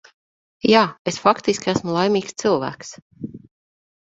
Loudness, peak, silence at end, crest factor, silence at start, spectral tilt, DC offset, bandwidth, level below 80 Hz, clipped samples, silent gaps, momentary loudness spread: -20 LUFS; 0 dBFS; 0.7 s; 22 dB; 0.65 s; -4.5 dB/octave; under 0.1%; 8 kHz; -58 dBFS; under 0.1%; 0.99-1.05 s, 3.02-3.10 s; 20 LU